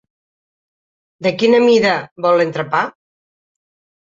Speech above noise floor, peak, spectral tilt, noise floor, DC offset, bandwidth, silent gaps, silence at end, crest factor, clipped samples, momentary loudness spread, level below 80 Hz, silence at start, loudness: over 76 dB; -2 dBFS; -5.5 dB/octave; under -90 dBFS; under 0.1%; 7.8 kHz; 2.11-2.16 s; 1.2 s; 16 dB; under 0.1%; 10 LU; -62 dBFS; 1.2 s; -15 LUFS